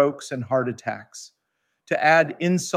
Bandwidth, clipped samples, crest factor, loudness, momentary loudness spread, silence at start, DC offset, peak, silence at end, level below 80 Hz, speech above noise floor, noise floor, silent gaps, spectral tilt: 15.5 kHz; under 0.1%; 18 dB; -22 LUFS; 18 LU; 0 s; under 0.1%; -4 dBFS; 0 s; -72 dBFS; 53 dB; -76 dBFS; none; -5 dB/octave